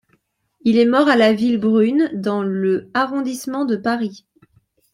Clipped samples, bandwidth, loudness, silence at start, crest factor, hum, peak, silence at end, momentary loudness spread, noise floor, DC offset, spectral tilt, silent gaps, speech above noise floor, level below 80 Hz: under 0.1%; 15.5 kHz; -18 LUFS; 0.65 s; 16 dB; none; -2 dBFS; 0.75 s; 10 LU; -64 dBFS; under 0.1%; -6 dB/octave; none; 47 dB; -62 dBFS